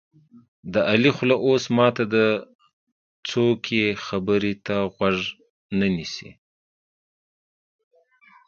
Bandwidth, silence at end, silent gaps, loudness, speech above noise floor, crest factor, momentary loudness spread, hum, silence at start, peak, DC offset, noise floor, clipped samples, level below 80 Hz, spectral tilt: 7.4 kHz; 2.15 s; 2.55-2.59 s, 2.73-3.23 s, 5.50-5.69 s; -22 LUFS; 34 dB; 24 dB; 10 LU; none; 0.65 s; 0 dBFS; under 0.1%; -56 dBFS; under 0.1%; -56 dBFS; -6 dB/octave